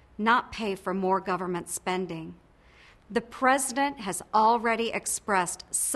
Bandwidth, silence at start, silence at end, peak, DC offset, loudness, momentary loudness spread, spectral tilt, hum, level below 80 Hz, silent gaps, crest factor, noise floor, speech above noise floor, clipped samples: 12.5 kHz; 0.2 s; 0 s; -8 dBFS; under 0.1%; -27 LUFS; 9 LU; -3 dB/octave; none; -60 dBFS; none; 20 dB; -56 dBFS; 28 dB; under 0.1%